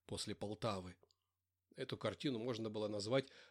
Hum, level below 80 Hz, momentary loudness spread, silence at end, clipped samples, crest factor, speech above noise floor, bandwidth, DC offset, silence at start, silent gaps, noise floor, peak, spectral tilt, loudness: none; -76 dBFS; 10 LU; 0 s; under 0.1%; 20 dB; over 47 dB; 15 kHz; under 0.1%; 0.1 s; none; under -90 dBFS; -24 dBFS; -5 dB/octave; -43 LUFS